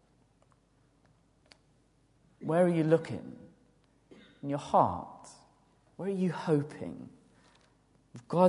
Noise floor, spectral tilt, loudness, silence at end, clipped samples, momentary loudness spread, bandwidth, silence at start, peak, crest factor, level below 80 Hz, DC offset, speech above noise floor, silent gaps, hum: -68 dBFS; -8 dB/octave; -31 LUFS; 0 s; under 0.1%; 25 LU; 11 kHz; 2.4 s; -10 dBFS; 24 dB; -66 dBFS; under 0.1%; 38 dB; none; none